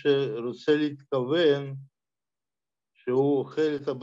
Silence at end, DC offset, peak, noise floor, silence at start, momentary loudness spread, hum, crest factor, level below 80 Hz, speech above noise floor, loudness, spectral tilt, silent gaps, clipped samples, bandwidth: 0 s; under 0.1%; -12 dBFS; under -90 dBFS; 0.05 s; 10 LU; none; 16 dB; -76 dBFS; over 64 dB; -26 LUFS; -7 dB/octave; none; under 0.1%; 7.6 kHz